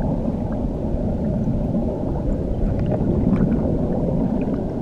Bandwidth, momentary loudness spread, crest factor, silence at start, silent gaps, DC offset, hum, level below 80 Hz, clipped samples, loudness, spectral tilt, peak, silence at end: 7.4 kHz; 5 LU; 14 dB; 0 s; none; under 0.1%; none; -28 dBFS; under 0.1%; -22 LUFS; -11 dB/octave; -6 dBFS; 0 s